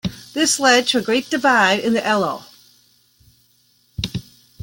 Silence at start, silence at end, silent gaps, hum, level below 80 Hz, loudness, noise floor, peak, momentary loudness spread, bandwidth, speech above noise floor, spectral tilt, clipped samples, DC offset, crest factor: 0.05 s; 0.4 s; none; none; -48 dBFS; -17 LUFS; -59 dBFS; -2 dBFS; 15 LU; 17 kHz; 42 dB; -3 dB/octave; under 0.1%; under 0.1%; 18 dB